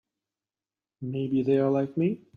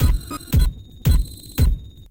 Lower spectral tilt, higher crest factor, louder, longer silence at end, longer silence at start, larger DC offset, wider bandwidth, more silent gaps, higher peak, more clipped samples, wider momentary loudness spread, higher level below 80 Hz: first, -10 dB/octave vs -6 dB/octave; about the same, 16 dB vs 14 dB; second, -27 LUFS vs -23 LUFS; about the same, 0.2 s vs 0.1 s; first, 1 s vs 0 s; second, under 0.1% vs 0.7%; second, 6.2 kHz vs 17.5 kHz; neither; second, -12 dBFS vs -6 dBFS; neither; first, 11 LU vs 7 LU; second, -68 dBFS vs -20 dBFS